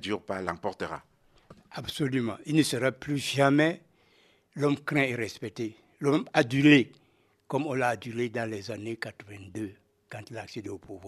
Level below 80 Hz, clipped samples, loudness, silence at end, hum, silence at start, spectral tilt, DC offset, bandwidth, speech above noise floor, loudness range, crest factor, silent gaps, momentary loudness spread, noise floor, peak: -66 dBFS; under 0.1%; -28 LUFS; 0 s; none; 0 s; -5.5 dB/octave; under 0.1%; 13 kHz; 36 dB; 7 LU; 24 dB; none; 18 LU; -64 dBFS; -4 dBFS